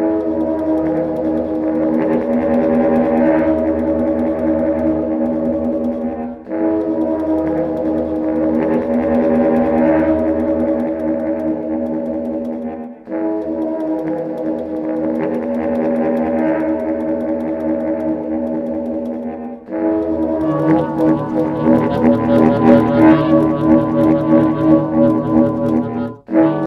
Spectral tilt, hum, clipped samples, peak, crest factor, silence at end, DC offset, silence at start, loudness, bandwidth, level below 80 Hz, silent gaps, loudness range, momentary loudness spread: -10 dB/octave; none; under 0.1%; 0 dBFS; 16 dB; 0 s; under 0.1%; 0 s; -16 LUFS; 4.7 kHz; -42 dBFS; none; 8 LU; 9 LU